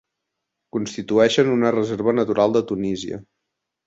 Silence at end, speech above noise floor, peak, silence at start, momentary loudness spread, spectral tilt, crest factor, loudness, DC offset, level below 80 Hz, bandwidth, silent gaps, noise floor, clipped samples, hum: 0.65 s; 61 dB; -2 dBFS; 0.75 s; 12 LU; -5.5 dB/octave; 18 dB; -20 LUFS; under 0.1%; -58 dBFS; 8 kHz; none; -80 dBFS; under 0.1%; none